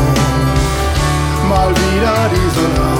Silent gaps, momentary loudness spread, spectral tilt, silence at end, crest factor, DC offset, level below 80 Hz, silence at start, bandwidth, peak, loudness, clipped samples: none; 2 LU; -5.5 dB/octave; 0 s; 12 dB; under 0.1%; -20 dBFS; 0 s; 18 kHz; 0 dBFS; -14 LUFS; under 0.1%